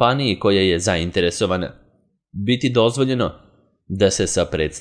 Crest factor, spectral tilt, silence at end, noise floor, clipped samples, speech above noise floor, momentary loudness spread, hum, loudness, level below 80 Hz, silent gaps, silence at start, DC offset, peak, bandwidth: 20 dB; -4.5 dB/octave; 0 s; -61 dBFS; under 0.1%; 42 dB; 9 LU; none; -19 LUFS; -44 dBFS; none; 0 s; under 0.1%; 0 dBFS; 10.5 kHz